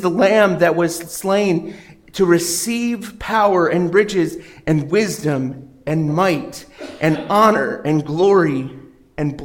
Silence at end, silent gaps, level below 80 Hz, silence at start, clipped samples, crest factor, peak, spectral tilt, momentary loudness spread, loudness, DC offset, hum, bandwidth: 0 s; none; -50 dBFS; 0 s; under 0.1%; 16 dB; -2 dBFS; -5.5 dB/octave; 14 LU; -17 LUFS; under 0.1%; none; 17 kHz